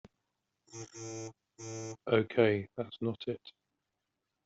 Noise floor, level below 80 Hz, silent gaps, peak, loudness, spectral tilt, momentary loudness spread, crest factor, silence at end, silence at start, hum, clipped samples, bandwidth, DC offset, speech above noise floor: -86 dBFS; -72 dBFS; none; -12 dBFS; -34 LUFS; -5.5 dB/octave; 20 LU; 24 dB; 0.95 s; 0.7 s; none; under 0.1%; 8 kHz; under 0.1%; 53 dB